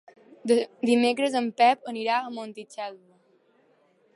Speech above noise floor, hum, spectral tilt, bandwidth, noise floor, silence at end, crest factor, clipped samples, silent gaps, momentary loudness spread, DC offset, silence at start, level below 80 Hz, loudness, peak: 39 dB; none; -4 dB/octave; 11.5 kHz; -64 dBFS; 1.2 s; 18 dB; under 0.1%; none; 16 LU; under 0.1%; 0.45 s; -80 dBFS; -24 LUFS; -8 dBFS